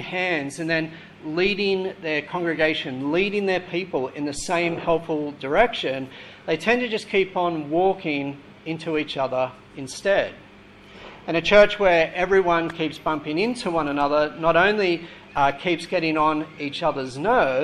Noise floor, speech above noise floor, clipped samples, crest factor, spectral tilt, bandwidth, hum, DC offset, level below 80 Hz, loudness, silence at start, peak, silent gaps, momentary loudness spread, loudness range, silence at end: -47 dBFS; 24 dB; under 0.1%; 20 dB; -5 dB/octave; 12 kHz; none; under 0.1%; -50 dBFS; -22 LUFS; 0 s; -2 dBFS; none; 11 LU; 4 LU; 0 s